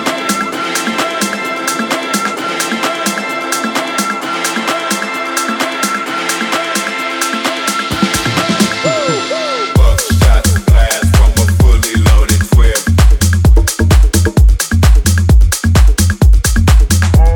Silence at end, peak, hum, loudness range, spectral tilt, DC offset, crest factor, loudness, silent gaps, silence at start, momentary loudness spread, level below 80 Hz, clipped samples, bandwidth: 0 s; 0 dBFS; none; 5 LU; -4.5 dB/octave; under 0.1%; 10 dB; -12 LUFS; none; 0 s; 6 LU; -12 dBFS; under 0.1%; 19 kHz